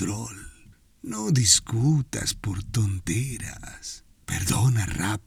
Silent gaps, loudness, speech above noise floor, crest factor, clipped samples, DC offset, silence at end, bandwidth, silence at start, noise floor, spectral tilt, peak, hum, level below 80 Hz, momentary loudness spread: none; -24 LUFS; 29 dB; 22 dB; under 0.1%; under 0.1%; 0.05 s; 17.5 kHz; 0 s; -54 dBFS; -3.5 dB/octave; -4 dBFS; none; -46 dBFS; 19 LU